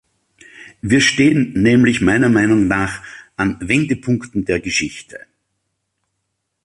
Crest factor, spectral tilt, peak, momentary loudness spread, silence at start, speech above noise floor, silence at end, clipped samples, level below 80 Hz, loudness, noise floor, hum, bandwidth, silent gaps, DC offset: 16 dB; -5 dB/octave; -2 dBFS; 13 LU; 0.6 s; 58 dB; 1.5 s; under 0.1%; -42 dBFS; -15 LUFS; -73 dBFS; none; 11.5 kHz; none; under 0.1%